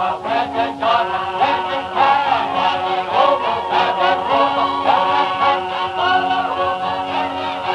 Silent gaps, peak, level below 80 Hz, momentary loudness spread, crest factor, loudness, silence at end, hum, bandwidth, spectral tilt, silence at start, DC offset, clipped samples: none; -2 dBFS; -54 dBFS; 5 LU; 16 dB; -17 LUFS; 0 s; none; 10.5 kHz; -4.5 dB/octave; 0 s; under 0.1%; under 0.1%